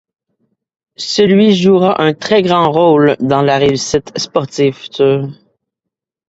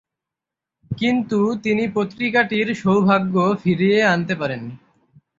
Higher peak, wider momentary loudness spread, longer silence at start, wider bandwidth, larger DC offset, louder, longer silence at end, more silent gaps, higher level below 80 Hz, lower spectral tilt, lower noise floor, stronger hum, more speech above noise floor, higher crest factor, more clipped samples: about the same, 0 dBFS vs -2 dBFS; about the same, 8 LU vs 8 LU; about the same, 1 s vs 0.9 s; about the same, 8 kHz vs 7.6 kHz; neither; first, -12 LUFS vs -19 LUFS; first, 0.95 s vs 0.6 s; neither; first, -50 dBFS vs -58 dBFS; second, -5.5 dB/octave vs -7 dB/octave; second, -80 dBFS vs -86 dBFS; neither; about the same, 69 dB vs 68 dB; second, 12 dB vs 18 dB; neither